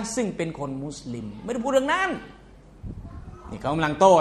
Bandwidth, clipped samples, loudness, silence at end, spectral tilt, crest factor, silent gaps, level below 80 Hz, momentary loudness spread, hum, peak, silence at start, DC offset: 12.5 kHz; under 0.1%; -25 LUFS; 0 s; -5 dB/octave; 20 dB; none; -48 dBFS; 20 LU; none; -4 dBFS; 0 s; under 0.1%